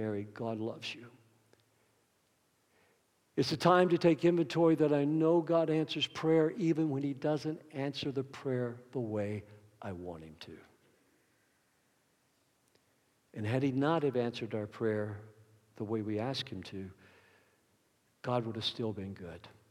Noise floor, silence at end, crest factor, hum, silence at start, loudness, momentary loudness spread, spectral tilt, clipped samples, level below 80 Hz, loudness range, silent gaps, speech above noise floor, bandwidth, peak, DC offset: -74 dBFS; 0.2 s; 22 dB; none; 0 s; -33 LUFS; 18 LU; -6.5 dB/octave; under 0.1%; -78 dBFS; 15 LU; none; 41 dB; 12.5 kHz; -12 dBFS; under 0.1%